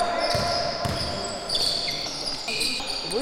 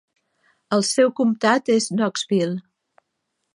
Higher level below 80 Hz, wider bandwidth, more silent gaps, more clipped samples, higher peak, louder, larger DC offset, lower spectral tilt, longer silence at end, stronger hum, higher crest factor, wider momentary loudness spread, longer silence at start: first, -44 dBFS vs -74 dBFS; first, 17 kHz vs 11.5 kHz; neither; neither; second, -10 dBFS vs -4 dBFS; second, -25 LUFS vs -20 LUFS; neither; second, -2.5 dB/octave vs -4.5 dB/octave; second, 0 s vs 0.95 s; neither; about the same, 16 dB vs 18 dB; about the same, 5 LU vs 6 LU; second, 0 s vs 0.7 s